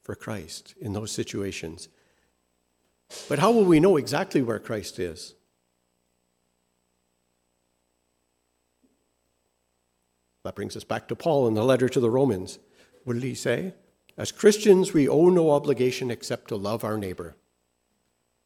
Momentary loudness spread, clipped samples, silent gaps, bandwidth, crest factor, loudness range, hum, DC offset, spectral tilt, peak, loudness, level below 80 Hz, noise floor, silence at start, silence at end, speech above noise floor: 21 LU; under 0.1%; none; 16 kHz; 22 dB; 14 LU; 60 Hz at -55 dBFS; under 0.1%; -6 dB/octave; -4 dBFS; -24 LUFS; -62 dBFS; -74 dBFS; 0.1 s; 1.15 s; 50 dB